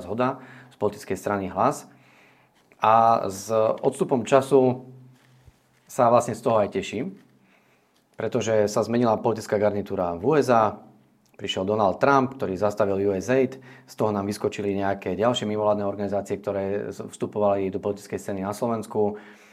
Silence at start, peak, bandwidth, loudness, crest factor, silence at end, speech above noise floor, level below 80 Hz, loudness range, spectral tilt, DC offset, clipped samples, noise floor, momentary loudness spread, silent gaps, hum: 0 s; -4 dBFS; 15 kHz; -24 LUFS; 20 dB; 0.2 s; 39 dB; -68 dBFS; 4 LU; -6 dB/octave; under 0.1%; under 0.1%; -63 dBFS; 11 LU; none; none